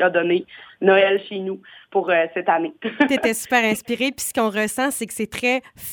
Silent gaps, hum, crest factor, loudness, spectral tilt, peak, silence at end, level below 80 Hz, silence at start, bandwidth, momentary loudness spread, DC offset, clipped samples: none; none; 18 dB; -20 LUFS; -3.5 dB/octave; -2 dBFS; 0 s; -60 dBFS; 0 s; over 20 kHz; 10 LU; under 0.1%; under 0.1%